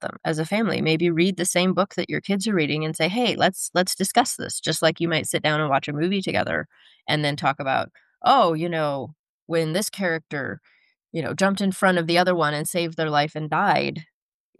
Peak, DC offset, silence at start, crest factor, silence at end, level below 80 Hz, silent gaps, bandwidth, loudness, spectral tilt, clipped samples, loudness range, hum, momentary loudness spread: -4 dBFS; under 0.1%; 0 s; 18 dB; 0.55 s; -68 dBFS; 9.19-9.47 s; 12.5 kHz; -23 LUFS; -4.5 dB/octave; under 0.1%; 2 LU; none; 9 LU